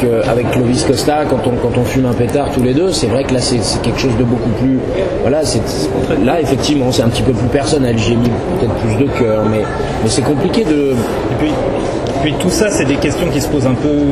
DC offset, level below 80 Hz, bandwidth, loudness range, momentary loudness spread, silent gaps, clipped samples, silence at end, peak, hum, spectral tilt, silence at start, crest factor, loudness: under 0.1%; -30 dBFS; 13.5 kHz; 1 LU; 3 LU; none; under 0.1%; 0 s; 0 dBFS; none; -5.5 dB/octave; 0 s; 14 dB; -14 LUFS